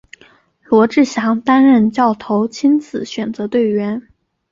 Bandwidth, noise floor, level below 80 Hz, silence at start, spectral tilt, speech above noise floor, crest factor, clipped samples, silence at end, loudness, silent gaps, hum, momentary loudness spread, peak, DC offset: 7.6 kHz; -50 dBFS; -58 dBFS; 0.7 s; -6 dB/octave; 36 dB; 14 dB; under 0.1%; 0.5 s; -15 LUFS; none; none; 12 LU; -2 dBFS; under 0.1%